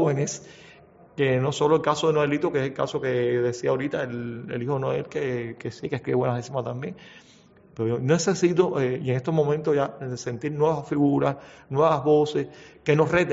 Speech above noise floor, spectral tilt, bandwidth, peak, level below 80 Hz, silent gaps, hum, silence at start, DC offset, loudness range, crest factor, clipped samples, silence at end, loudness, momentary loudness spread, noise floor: 29 dB; -6 dB/octave; 8 kHz; -6 dBFS; -60 dBFS; none; none; 0 s; under 0.1%; 5 LU; 18 dB; under 0.1%; 0 s; -25 LUFS; 11 LU; -53 dBFS